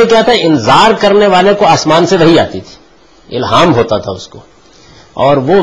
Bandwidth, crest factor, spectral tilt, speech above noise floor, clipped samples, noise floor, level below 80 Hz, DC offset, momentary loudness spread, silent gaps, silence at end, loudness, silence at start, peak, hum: 11 kHz; 8 dB; -5 dB/octave; 35 dB; 0.1%; -43 dBFS; -40 dBFS; 1%; 15 LU; none; 0 s; -8 LUFS; 0 s; 0 dBFS; none